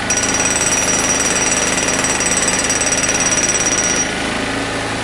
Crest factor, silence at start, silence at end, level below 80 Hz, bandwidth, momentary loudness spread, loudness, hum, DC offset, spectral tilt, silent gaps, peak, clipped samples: 14 dB; 0 s; 0 s; -38 dBFS; 11.5 kHz; 6 LU; -14 LUFS; none; under 0.1%; -1.5 dB/octave; none; -2 dBFS; under 0.1%